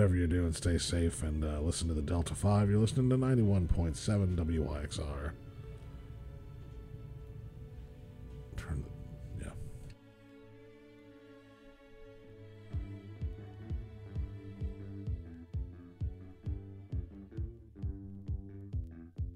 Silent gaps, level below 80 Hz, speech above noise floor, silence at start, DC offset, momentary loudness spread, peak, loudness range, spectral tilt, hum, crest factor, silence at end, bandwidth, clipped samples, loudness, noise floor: none; -44 dBFS; 26 dB; 0 s; under 0.1%; 24 LU; -16 dBFS; 18 LU; -6.5 dB/octave; none; 20 dB; 0 s; 12.5 kHz; under 0.1%; -36 LUFS; -57 dBFS